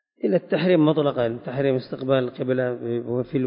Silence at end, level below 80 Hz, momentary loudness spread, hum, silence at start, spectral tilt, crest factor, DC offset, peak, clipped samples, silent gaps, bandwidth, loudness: 0 s; -60 dBFS; 8 LU; none; 0.25 s; -12 dB/octave; 16 dB; under 0.1%; -6 dBFS; under 0.1%; none; 5.4 kHz; -23 LUFS